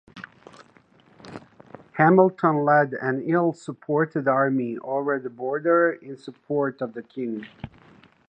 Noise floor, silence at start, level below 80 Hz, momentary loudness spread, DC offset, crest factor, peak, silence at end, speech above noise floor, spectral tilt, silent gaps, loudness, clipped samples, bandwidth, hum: -57 dBFS; 0.15 s; -64 dBFS; 24 LU; under 0.1%; 20 dB; -4 dBFS; 0.6 s; 34 dB; -8.5 dB/octave; none; -23 LUFS; under 0.1%; 8.8 kHz; none